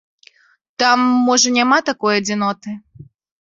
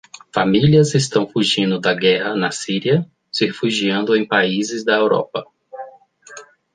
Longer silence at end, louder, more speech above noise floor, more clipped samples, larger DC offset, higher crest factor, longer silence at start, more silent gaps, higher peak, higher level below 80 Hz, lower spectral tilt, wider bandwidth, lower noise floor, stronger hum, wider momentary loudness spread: about the same, 0.35 s vs 0.35 s; about the same, -15 LUFS vs -17 LUFS; first, 42 dB vs 27 dB; neither; neither; about the same, 16 dB vs 16 dB; first, 0.8 s vs 0.35 s; neither; about the same, -2 dBFS vs -2 dBFS; about the same, -62 dBFS vs -58 dBFS; second, -2.5 dB/octave vs -5 dB/octave; second, 7.8 kHz vs 10 kHz; first, -58 dBFS vs -43 dBFS; neither; first, 18 LU vs 14 LU